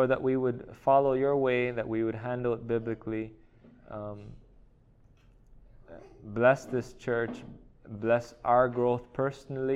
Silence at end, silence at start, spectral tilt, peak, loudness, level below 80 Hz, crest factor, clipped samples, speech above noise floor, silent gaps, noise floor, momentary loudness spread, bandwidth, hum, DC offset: 0 s; 0 s; -7.5 dB/octave; -10 dBFS; -29 LUFS; -56 dBFS; 20 dB; under 0.1%; 31 dB; none; -60 dBFS; 17 LU; 11 kHz; none; under 0.1%